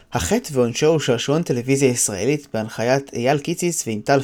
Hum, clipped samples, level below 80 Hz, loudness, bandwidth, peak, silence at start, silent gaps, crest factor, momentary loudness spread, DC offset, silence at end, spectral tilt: none; under 0.1%; -48 dBFS; -20 LUFS; 19.5 kHz; -4 dBFS; 0.1 s; none; 16 dB; 5 LU; under 0.1%; 0 s; -4.5 dB/octave